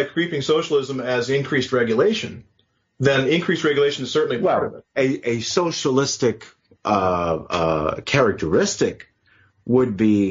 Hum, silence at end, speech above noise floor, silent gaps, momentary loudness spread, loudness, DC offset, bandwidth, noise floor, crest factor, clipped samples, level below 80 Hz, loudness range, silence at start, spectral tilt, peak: none; 0 s; 38 dB; none; 5 LU; -20 LUFS; under 0.1%; 7.6 kHz; -58 dBFS; 18 dB; under 0.1%; -52 dBFS; 1 LU; 0 s; -4.5 dB/octave; -4 dBFS